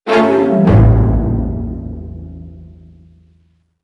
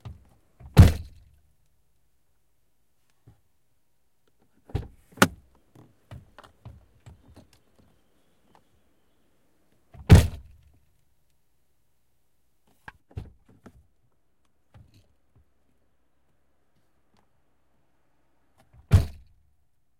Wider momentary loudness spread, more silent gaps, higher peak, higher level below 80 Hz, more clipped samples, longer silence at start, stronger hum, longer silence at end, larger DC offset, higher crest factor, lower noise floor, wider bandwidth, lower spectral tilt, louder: second, 22 LU vs 30 LU; neither; about the same, 0 dBFS vs 0 dBFS; first, -22 dBFS vs -38 dBFS; neither; second, 0.05 s vs 0.75 s; neither; first, 1.15 s vs 0.9 s; neither; second, 14 dB vs 28 dB; second, -55 dBFS vs -75 dBFS; second, 6 kHz vs 16.5 kHz; first, -9 dB/octave vs -6.5 dB/octave; first, -13 LUFS vs -22 LUFS